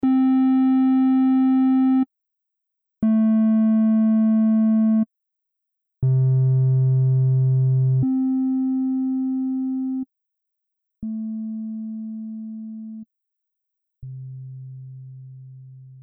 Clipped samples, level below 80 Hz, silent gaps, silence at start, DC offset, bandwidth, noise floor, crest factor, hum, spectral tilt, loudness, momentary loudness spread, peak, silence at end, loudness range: under 0.1%; -58 dBFS; none; 0.05 s; under 0.1%; 3.6 kHz; -81 dBFS; 10 dB; none; -14 dB/octave; -20 LUFS; 19 LU; -12 dBFS; 0.05 s; 16 LU